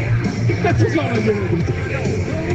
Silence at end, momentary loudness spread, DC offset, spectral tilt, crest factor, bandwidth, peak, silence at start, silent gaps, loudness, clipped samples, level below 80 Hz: 0 s; 4 LU; under 0.1%; -7.5 dB/octave; 12 dB; 8.2 kHz; -6 dBFS; 0 s; none; -19 LUFS; under 0.1%; -36 dBFS